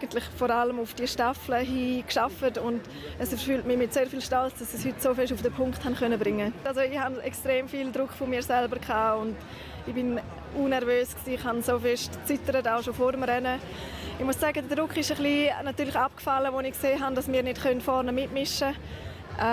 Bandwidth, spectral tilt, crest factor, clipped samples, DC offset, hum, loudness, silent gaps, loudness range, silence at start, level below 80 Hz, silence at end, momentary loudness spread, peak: 16 kHz; -4.5 dB/octave; 16 dB; under 0.1%; under 0.1%; none; -28 LUFS; none; 2 LU; 0 s; -48 dBFS; 0 s; 7 LU; -14 dBFS